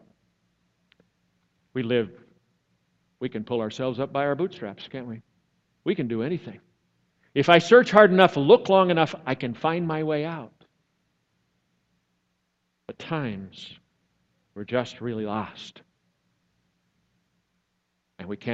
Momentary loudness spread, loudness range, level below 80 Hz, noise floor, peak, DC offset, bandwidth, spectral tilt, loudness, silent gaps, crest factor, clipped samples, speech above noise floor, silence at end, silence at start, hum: 24 LU; 19 LU; -68 dBFS; -76 dBFS; 0 dBFS; under 0.1%; 8 kHz; -6.5 dB/octave; -23 LUFS; none; 26 dB; under 0.1%; 53 dB; 0 s; 1.75 s; none